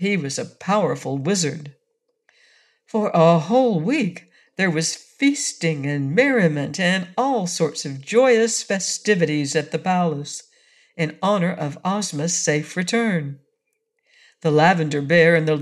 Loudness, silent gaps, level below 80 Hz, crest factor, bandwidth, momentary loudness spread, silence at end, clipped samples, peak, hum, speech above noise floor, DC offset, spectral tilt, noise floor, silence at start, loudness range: -20 LUFS; none; -72 dBFS; 18 dB; 12.5 kHz; 10 LU; 0 s; under 0.1%; -4 dBFS; none; 54 dB; under 0.1%; -4.5 dB/octave; -74 dBFS; 0 s; 3 LU